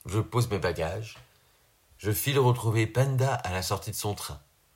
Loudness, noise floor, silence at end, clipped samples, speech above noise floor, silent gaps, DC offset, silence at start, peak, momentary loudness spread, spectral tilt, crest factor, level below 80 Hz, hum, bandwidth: -28 LUFS; -64 dBFS; 0.35 s; under 0.1%; 36 dB; none; under 0.1%; 0.05 s; -12 dBFS; 13 LU; -5.5 dB/octave; 18 dB; -52 dBFS; none; 16.5 kHz